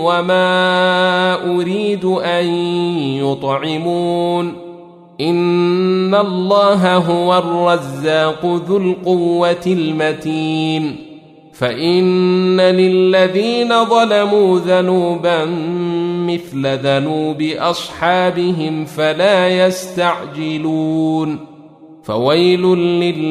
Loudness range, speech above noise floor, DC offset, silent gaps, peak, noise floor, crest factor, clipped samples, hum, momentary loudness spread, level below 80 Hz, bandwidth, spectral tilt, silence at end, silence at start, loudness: 4 LU; 26 dB; under 0.1%; none; 0 dBFS; -40 dBFS; 14 dB; under 0.1%; none; 7 LU; -58 dBFS; 13 kHz; -6 dB/octave; 0 s; 0 s; -15 LUFS